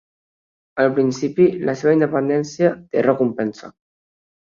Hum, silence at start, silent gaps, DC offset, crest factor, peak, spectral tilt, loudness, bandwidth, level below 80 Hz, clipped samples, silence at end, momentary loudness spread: none; 0.75 s; none; under 0.1%; 18 dB; -2 dBFS; -7 dB/octave; -19 LUFS; 7.4 kHz; -64 dBFS; under 0.1%; 0.8 s; 4 LU